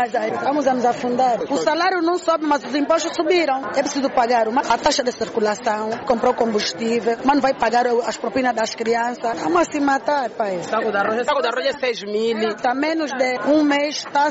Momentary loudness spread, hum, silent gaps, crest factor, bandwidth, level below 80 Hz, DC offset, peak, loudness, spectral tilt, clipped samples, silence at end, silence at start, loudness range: 4 LU; none; none; 14 dB; 8 kHz; -56 dBFS; under 0.1%; -6 dBFS; -20 LUFS; -2 dB/octave; under 0.1%; 0 s; 0 s; 2 LU